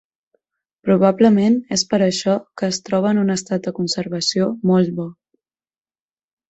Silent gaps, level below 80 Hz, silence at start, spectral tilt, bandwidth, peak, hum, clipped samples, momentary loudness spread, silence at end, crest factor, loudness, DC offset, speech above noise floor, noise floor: none; -60 dBFS; 0.85 s; -5.5 dB/octave; 8.2 kHz; -2 dBFS; none; under 0.1%; 10 LU; 1.4 s; 18 dB; -18 LUFS; under 0.1%; over 73 dB; under -90 dBFS